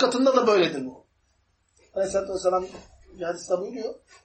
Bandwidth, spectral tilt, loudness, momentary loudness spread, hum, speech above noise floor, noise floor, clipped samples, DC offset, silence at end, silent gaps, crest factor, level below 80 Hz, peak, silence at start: 8.8 kHz; -4 dB/octave; -25 LUFS; 16 LU; none; 44 dB; -68 dBFS; under 0.1%; under 0.1%; 0.3 s; none; 20 dB; -60 dBFS; -6 dBFS; 0 s